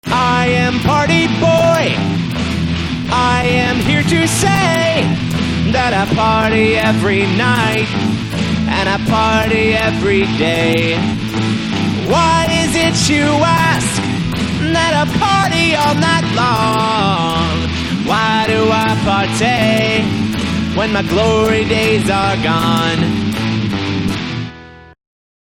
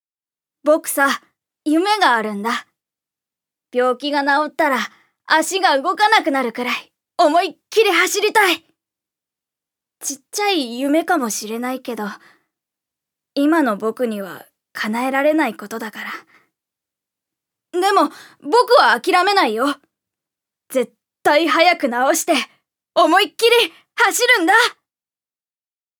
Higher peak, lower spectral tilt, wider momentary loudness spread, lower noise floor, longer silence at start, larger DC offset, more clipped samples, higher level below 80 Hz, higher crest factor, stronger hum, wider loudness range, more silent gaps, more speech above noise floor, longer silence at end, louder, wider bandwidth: about the same, 0 dBFS vs 0 dBFS; first, -5 dB/octave vs -2 dB/octave; second, 6 LU vs 14 LU; second, -34 dBFS vs under -90 dBFS; second, 0.05 s vs 0.65 s; neither; neither; first, -32 dBFS vs -80 dBFS; about the same, 14 dB vs 18 dB; neither; second, 1 LU vs 7 LU; neither; second, 21 dB vs over 73 dB; second, 0.65 s vs 1.25 s; first, -14 LUFS vs -17 LUFS; second, 17 kHz vs over 20 kHz